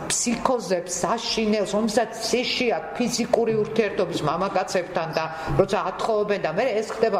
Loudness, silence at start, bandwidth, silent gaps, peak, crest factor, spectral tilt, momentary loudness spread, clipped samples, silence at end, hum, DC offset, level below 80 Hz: -24 LUFS; 0 s; 16 kHz; none; -6 dBFS; 18 dB; -3.5 dB/octave; 4 LU; under 0.1%; 0 s; none; under 0.1%; -48 dBFS